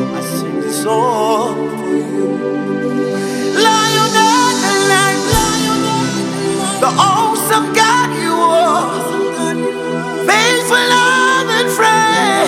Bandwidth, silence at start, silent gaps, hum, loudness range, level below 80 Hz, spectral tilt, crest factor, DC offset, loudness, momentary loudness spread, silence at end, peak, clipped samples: 17 kHz; 0 s; none; none; 3 LU; -40 dBFS; -3 dB/octave; 14 dB; under 0.1%; -13 LUFS; 8 LU; 0 s; 0 dBFS; under 0.1%